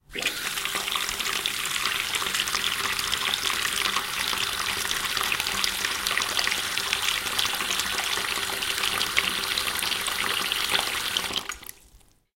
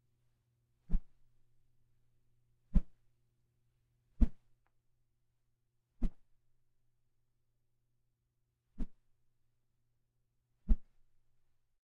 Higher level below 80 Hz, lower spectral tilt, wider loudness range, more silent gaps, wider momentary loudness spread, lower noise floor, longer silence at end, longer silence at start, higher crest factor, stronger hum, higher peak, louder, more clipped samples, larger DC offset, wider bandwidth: second, -52 dBFS vs -42 dBFS; second, 0.5 dB/octave vs -10.5 dB/octave; second, 1 LU vs 15 LU; neither; second, 3 LU vs 13 LU; second, -56 dBFS vs -82 dBFS; second, 0.4 s vs 1.05 s; second, 0.1 s vs 0.9 s; about the same, 26 dB vs 26 dB; neither; first, -2 dBFS vs -14 dBFS; first, -25 LUFS vs -41 LUFS; neither; neither; first, 17 kHz vs 2.1 kHz